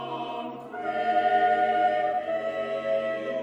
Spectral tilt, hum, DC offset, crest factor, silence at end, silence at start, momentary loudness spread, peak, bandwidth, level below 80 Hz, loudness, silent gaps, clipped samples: -5.5 dB/octave; none; under 0.1%; 14 dB; 0 s; 0 s; 12 LU; -12 dBFS; 7.8 kHz; -74 dBFS; -26 LUFS; none; under 0.1%